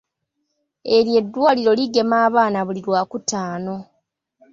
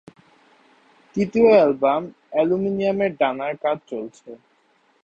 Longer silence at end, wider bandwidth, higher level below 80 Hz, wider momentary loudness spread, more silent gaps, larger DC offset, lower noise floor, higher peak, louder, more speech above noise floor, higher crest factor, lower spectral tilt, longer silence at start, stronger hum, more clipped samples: about the same, 0.7 s vs 0.7 s; about the same, 7.8 kHz vs 8 kHz; about the same, -64 dBFS vs -60 dBFS; second, 12 LU vs 16 LU; neither; neither; first, -75 dBFS vs -62 dBFS; about the same, -4 dBFS vs -4 dBFS; about the same, -18 LUFS vs -20 LUFS; first, 57 dB vs 42 dB; about the same, 16 dB vs 18 dB; second, -4.5 dB/octave vs -7.5 dB/octave; second, 0.85 s vs 1.15 s; neither; neither